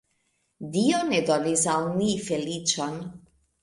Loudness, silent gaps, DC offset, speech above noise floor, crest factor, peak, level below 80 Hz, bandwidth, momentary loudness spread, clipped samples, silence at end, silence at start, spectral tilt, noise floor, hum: -25 LUFS; none; under 0.1%; 47 dB; 18 dB; -10 dBFS; -62 dBFS; 11.5 kHz; 11 LU; under 0.1%; 0.45 s; 0.6 s; -4 dB/octave; -72 dBFS; none